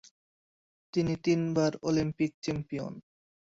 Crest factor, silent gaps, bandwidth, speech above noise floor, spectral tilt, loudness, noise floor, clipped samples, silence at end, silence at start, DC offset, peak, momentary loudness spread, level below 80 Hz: 16 dB; 2.34-2.42 s; 7.8 kHz; over 60 dB; -6.5 dB/octave; -31 LUFS; under -90 dBFS; under 0.1%; 0.45 s; 0.95 s; under 0.1%; -16 dBFS; 10 LU; -60 dBFS